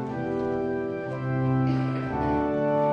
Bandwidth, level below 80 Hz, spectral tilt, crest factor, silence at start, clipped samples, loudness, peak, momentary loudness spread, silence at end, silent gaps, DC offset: 6.2 kHz; -48 dBFS; -9.5 dB/octave; 12 dB; 0 s; under 0.1%; -27 LUFS; -14 dBFS; 5 LU; 0 s; none; under 0.1%